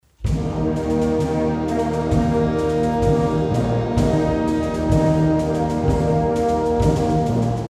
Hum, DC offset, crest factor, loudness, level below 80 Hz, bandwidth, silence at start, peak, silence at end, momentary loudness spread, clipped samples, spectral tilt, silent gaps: none; under 0.1%; 14 dB; -20 LUFS; -30 dBFS; 12.5 kHz; 0.2 s; -4 dBFS; 0 s; 3 LU; under 0.1%; -8 dB/octave; none